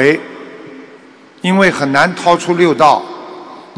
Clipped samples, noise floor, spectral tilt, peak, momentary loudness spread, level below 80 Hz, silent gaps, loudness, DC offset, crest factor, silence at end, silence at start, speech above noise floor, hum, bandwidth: 0.7%; -40 dBFS; -5 dB/octave; 0 dBFS; 22 LU; -54 dBFS; none; -12 LUFS; under 0.1%; 14 dB; 0.15 s; 0 s; 29 dB; none; 11 kHz